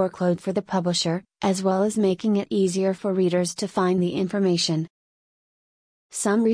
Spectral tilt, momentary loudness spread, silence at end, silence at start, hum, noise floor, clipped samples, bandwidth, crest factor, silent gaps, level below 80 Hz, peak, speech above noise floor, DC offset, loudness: -5.5 dB/octave; 5 LU; 0 s; 0 s; none; under -90 dBFS; under 0.1%; 10.5 kHz; 14 dB; 4.90-6.09 s; -64 dBFS; -10 dBFS; over 67 dB; under 0.1%; -23 LUFS